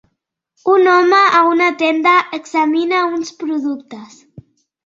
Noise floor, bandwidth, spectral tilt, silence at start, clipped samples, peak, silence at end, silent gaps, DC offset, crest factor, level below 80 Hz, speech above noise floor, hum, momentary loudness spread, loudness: -71 dBFS; 7.6 kHz; -3.5 dB/octave; 0.65 s; under 0.1%; -2 dBFS; 0.8 s; none; under 0.1%; 14 dB; -66 dBFS; 58 dB; none; 13 LU; -14 LUFS